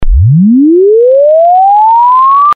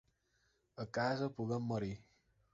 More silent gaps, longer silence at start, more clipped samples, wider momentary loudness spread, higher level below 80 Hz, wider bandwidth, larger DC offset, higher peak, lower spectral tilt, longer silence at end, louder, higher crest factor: neither; second, 0 s vs 0.75 s; neither; second, 1 LU vs 14 LU; first, -16 dBFS vs -68 dBFS; second, 4.6 kHz vs 7.6 kHz; neither; first, 0 dBFS vs -24 dBFS; first, -12 dB/octave vs -5.5 dB/octave; second, 0 s vs 0.5 s; first, -5 LUFS vs -40 LUFS; second, 4 dB vs 18 dB